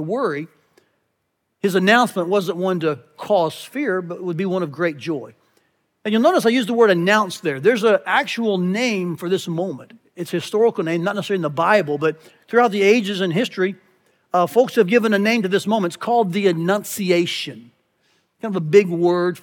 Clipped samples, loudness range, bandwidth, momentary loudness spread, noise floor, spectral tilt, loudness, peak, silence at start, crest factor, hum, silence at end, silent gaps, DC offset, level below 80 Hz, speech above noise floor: under 0.1%; 4 LU; 18.5 kHz; 11 LU; -73 dBFS; -5.5 dB/octave; -19 LUFS; -2 dBFS; 0 s; 18 dB; none; 0.05 s; none; under 0.1%; -82 dBFS; 54 dB